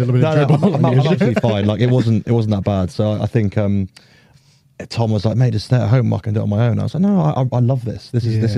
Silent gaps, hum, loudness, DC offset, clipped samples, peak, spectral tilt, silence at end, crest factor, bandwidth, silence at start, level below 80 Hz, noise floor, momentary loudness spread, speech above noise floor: none; none; -17 LUFS; under 0.1%; under 0.1%; -2 dBFS; -8.5 dB/octave; 0 s; 14 dB; 10 kHz; 0 s; -48 dBFS; -52 dBFS; 6 LU; 36 dB